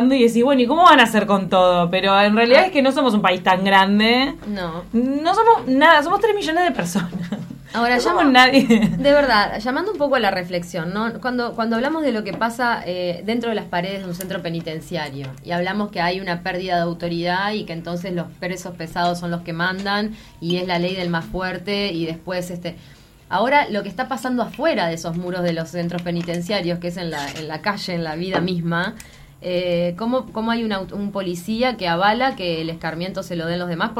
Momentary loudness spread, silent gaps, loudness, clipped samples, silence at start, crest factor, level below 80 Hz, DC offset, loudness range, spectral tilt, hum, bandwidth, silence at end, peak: 13 LU; none; -19 LUFS; under 0.1%; 0 s; 18 dB; -48 dBFS; under 0.1%; 9 LU; -5.5 dB/octave; none; 16 kHz; 0 s; 0 dBFS